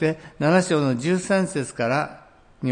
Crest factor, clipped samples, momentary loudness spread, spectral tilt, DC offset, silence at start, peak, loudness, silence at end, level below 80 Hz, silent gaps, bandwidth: 16 dB; under 0.1%; 7 LU; -6 dB/octave; under 0.1%; 0 s; -6 dBFS; -23 LUFS; 0 s; -58 dBFS; none; 10.5 kHz